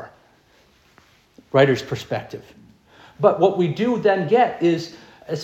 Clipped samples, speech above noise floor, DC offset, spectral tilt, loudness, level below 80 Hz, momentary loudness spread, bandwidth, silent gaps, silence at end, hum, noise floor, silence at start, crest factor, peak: under 0.1%; 38 dB; under 0.1%; -6.5 dB/octave; -20 LUFS; -62 dBFS; 13 LU; 14 kHz; none; 0 s; none; -56 dBFS; 0 s; 20 dB; -2 dBFS